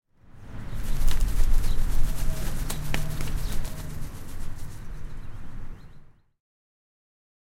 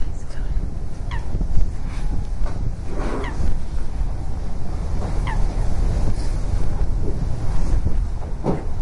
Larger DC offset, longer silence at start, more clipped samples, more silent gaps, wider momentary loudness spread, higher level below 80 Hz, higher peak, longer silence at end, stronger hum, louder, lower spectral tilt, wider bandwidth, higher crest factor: neither; first, 0.35 s vs 0 s; neither; neither; first, 15 LU vs 6 LU; about the same, -26 dBFS vs -22 dBFS; second, -8 dBFS vs -2 dBFS; first, 1.5 s vs 0 s; neither; second, -34 LUFS vs -27 LUFS; second, -4.5 dB/octave vs -7 dB/octave; first, 15.5 kHz vs 10.5 kHz; about the same, 16 dB vs 16 dB